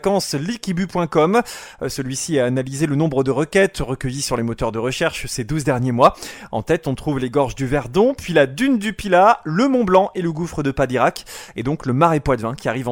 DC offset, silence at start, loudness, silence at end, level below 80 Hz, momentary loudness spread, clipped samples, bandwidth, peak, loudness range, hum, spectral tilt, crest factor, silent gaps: under 0.1%; 0.05 s; -19 LUFS; 0 s; -40 dBFS; 9 LU; under 0.1%; 17 kHz; 0 dBFS; 3 LU; none; -5.5 dB/octave; 18 dB; none